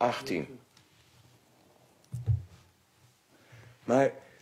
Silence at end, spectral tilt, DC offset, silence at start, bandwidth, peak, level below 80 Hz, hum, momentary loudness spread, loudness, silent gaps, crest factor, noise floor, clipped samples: 0.2 s; -6.5 dB/octave; under 0.1%; 0 s; 15 kHz; -12 dBFS; -58 dBFS; none; 27 LU; -32 LUFS; none; 22 dB; -65 dBFS; under 0.1%